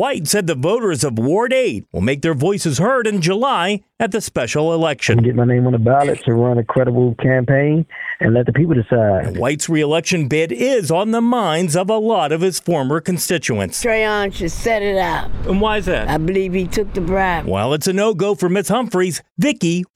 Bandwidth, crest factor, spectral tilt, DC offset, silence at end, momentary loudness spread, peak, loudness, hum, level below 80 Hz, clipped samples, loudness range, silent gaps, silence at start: 16 kHz; 14 dB; -5.5 dB/octave; under 0.1%; 0.1 s; 5 LU; -2 dBFS; -17 LUFS; none; -36 dBFS; under 0.1%; 3 LU; 19.31-19.36 s; 0 s